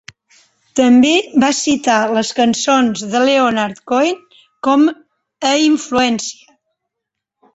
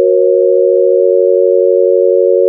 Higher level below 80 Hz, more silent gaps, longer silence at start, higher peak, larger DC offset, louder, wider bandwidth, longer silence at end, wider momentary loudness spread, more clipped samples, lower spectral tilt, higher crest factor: first, -56 dBFS vs under -90 dBFS; neither; first, 0.75 s vs 0 s; about the same, -2 dBFS vs 0 dBFS; neither; second, -14 LUFS vs -9 LUFS; first, 8.2 kHz vs 0.6 kHz; first, 1.2 s vs 0 s; first, 9 LU vs 0 LU; neither; second, -3 dB/octave vs -12.5 dB/octave; first, 14 dB vs 8 dB